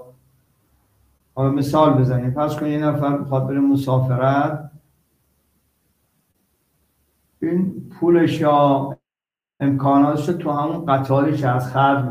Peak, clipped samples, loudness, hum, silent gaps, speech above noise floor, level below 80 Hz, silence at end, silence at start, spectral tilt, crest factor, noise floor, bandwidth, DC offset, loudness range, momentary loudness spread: -2 dBFS; under 0.1%; -19 LUFS; none; none; over 72 dB; -54 dBFS; 0 s; 0 s; -8.5 dB/octave; 18 dB; under -90 dBFS; 15 kHz; under 0.1%; 8 LU; 7 LU